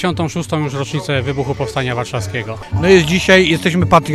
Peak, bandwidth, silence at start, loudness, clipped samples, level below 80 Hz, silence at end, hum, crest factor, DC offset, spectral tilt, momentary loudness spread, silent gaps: 0 dBFS; 14 kHz; 0 s; -15 LUFS; under 0.1%; -36 dBFS; 0 s; none; 14 dB; under 0.1%; -5.5 dB/octave; 11 LU; none